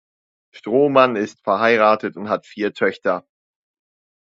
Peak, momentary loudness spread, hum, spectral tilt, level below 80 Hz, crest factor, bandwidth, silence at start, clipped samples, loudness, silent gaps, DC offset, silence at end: 0 dBFS; 11 LU; none; -6 dB/octave; -68 dBFS; 20 dB; 7.8 kHz; 0.55 s; under 0.1%; -18 LUFS; none; under 0.1%; 1.1 s